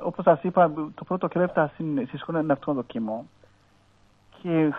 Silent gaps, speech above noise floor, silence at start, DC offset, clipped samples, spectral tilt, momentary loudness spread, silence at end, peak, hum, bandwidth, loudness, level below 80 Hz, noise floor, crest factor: none; 35 dB; 0 s; under 0.1%; under 0.1%; -10 dB/octave; 10 LU; 0 s; -6 dBFS; none; 4.3 kHz; -25 LUFS; -64 dBFS; -60 dBFS; 20 dB